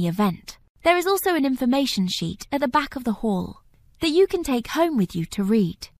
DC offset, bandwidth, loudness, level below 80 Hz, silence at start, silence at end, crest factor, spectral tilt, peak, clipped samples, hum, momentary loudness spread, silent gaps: under 0.1%; 15.5 kHz; -23 LUFS; -48 dBFS; 0 s; 0.15 s; 18 dB; -5.5 dB/octave; -4 dBFS; under 0.1%; none; 7 LU; 0.70-0.75 s